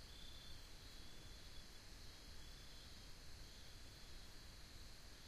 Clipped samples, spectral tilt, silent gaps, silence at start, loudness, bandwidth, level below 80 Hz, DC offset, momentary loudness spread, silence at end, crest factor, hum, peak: under 0.1%; -3 dB/octave; none; 0 s; -59 LUFS; 15.5 kHz; -60 dBFS; under 0.1%; 2 LU; 0 s; 14 dB; none; -42 dBFS